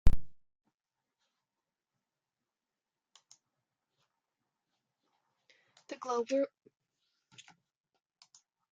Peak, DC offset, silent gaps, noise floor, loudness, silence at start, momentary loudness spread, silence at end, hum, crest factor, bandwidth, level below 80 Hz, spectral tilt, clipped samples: -8 dBFS; under 0.1%; 0.74-0.78 s; under -90 dBFS; -36 LUFS; 0.05 s; 24 LU; 2.25 s; none; 26 dB; 7.4 kHz; -44 dBFS; -6.5 dB/octave; under 0.1%